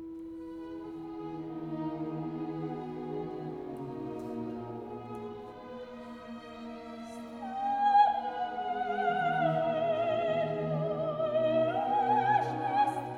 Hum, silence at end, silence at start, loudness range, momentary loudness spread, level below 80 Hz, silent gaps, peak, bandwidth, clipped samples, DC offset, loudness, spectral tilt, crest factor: none; 0 s; 0 s; 12 LU; 16 LU; -66 dBFS; none; -14 dBFS; 11.5 kHz; under 0.1%; under 0.1%; -32 LUFS; -7.5 dB/octave; 18 dB